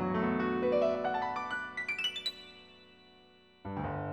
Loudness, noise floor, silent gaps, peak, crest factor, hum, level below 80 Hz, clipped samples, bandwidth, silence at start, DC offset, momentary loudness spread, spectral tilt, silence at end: -33 LUFS; -61 dBFS; none; -18 dBFS; 16 dB; none; -62 dBFS; under 0.1%; 17.5 kHz; 0 s; under 0.1%; 19 LU; -5.5 dB/octave; 0 s